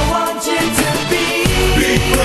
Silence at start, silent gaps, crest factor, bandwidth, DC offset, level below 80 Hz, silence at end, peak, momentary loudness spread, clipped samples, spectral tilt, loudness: 0 s; none; 14 dB; 13 kHz; under 0.1%; -24 dBFS; 0 s; 0 dBFS; 3 LU; under 0.1%; -4 dB/octave; -15 LUFS